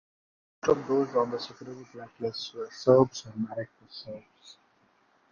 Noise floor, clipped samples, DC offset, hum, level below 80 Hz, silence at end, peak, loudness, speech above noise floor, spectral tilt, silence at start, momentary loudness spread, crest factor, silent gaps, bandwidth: -67 dBFS; under 0.1%; under 0.1%; none; -66 dBFS; 0.8 s; -8 dBFS; -28 LUFS; 38 dB; -6 dB/octave; 0.65 s; 22 LU; 22 dB; none; 7.2 kHz